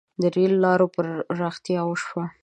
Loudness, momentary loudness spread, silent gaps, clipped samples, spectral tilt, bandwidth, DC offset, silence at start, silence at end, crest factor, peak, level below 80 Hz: -23 LUFS; 9 LU; none; under 0.1%; -7 dB/octave; 9 kHz; under 0.1%; 0.2 s; 0.15 s; 16 dB; -6 dBFS; -70 dBFS